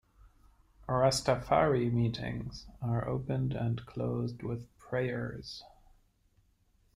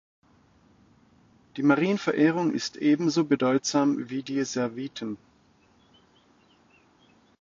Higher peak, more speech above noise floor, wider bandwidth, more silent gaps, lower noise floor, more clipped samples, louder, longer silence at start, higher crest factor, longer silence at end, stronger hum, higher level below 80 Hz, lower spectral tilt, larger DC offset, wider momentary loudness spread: second, -14 dBFS vs -8 dBFS; about the same, 38 dB vs 37 dB; first, 12.5 kHz vs 7.6 kHz; neither; first, -69 dBFS vs -62 dBFS; neither; second, -33 LUFS vs -26 LUFS; second, 0.25 s vs 1.55 s; about the same, 20 dB vs 18 dB; second, 1.3 s vs 2.25 s; neither; first, -54 dBFS vs -70 dBFS; about the same, -6 dB/octave vs -5 dB/octave; neither; first, 15 LU vs 12 LU